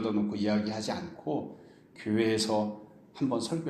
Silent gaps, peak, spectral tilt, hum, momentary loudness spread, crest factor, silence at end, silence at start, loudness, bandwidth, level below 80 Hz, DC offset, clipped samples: none; -14 dBFS; -5.5 dB/octave; none; 14 LU; 18 dB; 0 s; 0 s; -31 LUFS; 13 kHz; -68 dBFS; under 0.1%; under 0.1%